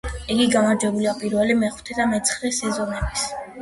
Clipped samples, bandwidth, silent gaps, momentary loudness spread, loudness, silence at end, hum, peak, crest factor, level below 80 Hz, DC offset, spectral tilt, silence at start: under 0.1%; 11.5 kHz; none; 7 LU; -21 LUFS; 0 s; none; -6 dBFS; 16 dB; -38 dBFS; under 0.1%; -3.5 dB/octave; 0.05 s